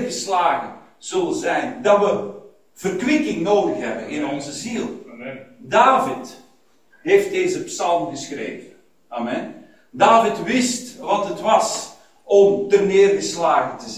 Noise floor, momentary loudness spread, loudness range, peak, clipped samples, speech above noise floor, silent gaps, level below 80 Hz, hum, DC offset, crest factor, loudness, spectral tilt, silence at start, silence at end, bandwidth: -58 dBFS; 18 LU; 5 LU; 0 dBFS; under 0.1%; 39 dB; none; -62 dBFS; none; 0.2%; 18 dB; -19 LUFS; -4 dB/octave; 0 s; 0 s; 15.5 kHz